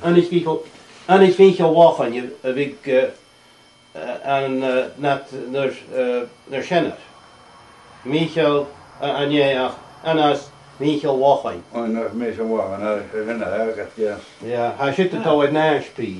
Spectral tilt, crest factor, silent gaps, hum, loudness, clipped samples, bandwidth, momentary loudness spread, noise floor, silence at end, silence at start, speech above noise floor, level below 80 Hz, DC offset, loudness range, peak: -6.5 dB/octave; 20 dB; none; none; -19 LUFS; under 0.1%; 11 kHz; 14 LU; -51 dBFS; 0 s; 0 s; 32 dB; -62 dBFS; under 0.1%; 7 LU; 0 dBFS